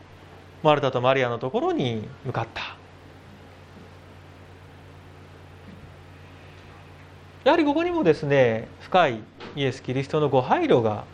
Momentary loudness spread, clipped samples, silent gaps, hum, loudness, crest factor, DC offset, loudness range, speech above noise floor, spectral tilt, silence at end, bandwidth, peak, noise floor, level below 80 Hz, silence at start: 15 LU; under 0.1%; none; none; -23 LUFS; 22 dB; under 0.1%; 23 LU; 24 dB; -7 dB/octave; 0.05 s; 9.8 kHz; -4 dBFS; -47 dBFS; -60 dBFS; 0.2 s